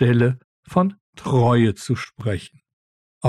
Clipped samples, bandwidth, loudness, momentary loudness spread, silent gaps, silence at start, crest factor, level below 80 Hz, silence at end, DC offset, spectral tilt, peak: under 0.1%; 11.5 kHz; -21 LUFS; 12 LU; 0.44-0.63 s, 1.01-1.13 s, 2.73-3.21 s; 0 s; 14 dB; -52 dBFS; 0 s; under 0.1%; -7.5 dB/octave; -6 dBFS